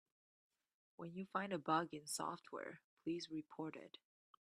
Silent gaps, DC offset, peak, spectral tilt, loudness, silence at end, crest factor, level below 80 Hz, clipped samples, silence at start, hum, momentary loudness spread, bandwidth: 2.84-2.97 s; under 0.1%; -24 dBFS; -4 dB/octave; -46 LUFS; 0.55 s; 22 dB; -90 dBFS; under 0.1%; 1 s; none; 16 LU; 12.5 kHz